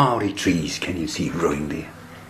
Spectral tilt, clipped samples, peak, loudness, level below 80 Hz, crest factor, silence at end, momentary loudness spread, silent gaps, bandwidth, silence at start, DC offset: -5 dB/octave; under 0.1%; -4 dBFS; -24 LUFS; -46 dBFS; 20 dB; 0 s; 9 LU; none; 14 kHz; 0 s; under 0.1%